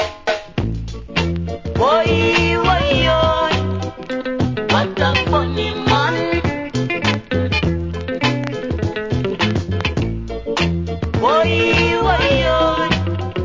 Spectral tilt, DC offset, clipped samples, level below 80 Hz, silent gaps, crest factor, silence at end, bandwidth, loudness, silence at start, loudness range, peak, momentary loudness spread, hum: -6 dB/octave; under 0.1%; under 0.1%; -28 dBFS; none; 16 dB; 0 s; 7.6 kHz; -18 LUFS; 0 s; 4 LU; -2 dBFS; 9 LU; none